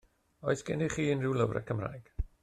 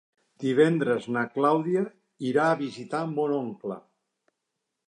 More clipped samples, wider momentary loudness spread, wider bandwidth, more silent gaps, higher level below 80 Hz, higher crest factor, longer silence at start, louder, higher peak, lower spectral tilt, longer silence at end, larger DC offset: neither; about the same, 11 LU vs 13 LU; first, 12.5 kHz vs 10.5 kHz; neither; first, -48 dBFS vs -78 dBFS; about the same, 18 dB vs 18 dB; about the same, 0.4 s vs 0.4 s; second, -33 LUFS vs -26 LUFS; second, -16 dBFS vs -8 dBFS; about the same, -6.5 dB/octave vs -7 dB/octave; second, 0.15 s vs 1.1 s; neither